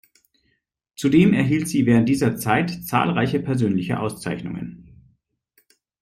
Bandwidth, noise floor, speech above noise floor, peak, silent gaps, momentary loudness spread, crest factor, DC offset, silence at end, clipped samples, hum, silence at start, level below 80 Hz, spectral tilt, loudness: 15.5 kHz; -71 dBFS; 51 dB; -4 dBFS; none; 12 LU; 18 dB; under 0.1%; 1.2 s; under 0.1%; none; 1 s; -54 dBFS; -6.5 dB/octave; -20 LUFS